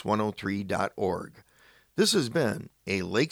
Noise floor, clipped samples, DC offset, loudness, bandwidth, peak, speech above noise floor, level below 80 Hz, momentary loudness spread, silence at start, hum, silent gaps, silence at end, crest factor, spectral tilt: -60 dBFS; under 0.1%; under 0.1%; -29 LUFS; over 20 kHz; -12 dBFS; 32 dB; -62 dBFS; 12 LU; 0 s; none; none; 0.05 s; 18 dB; -4.5 dB/octave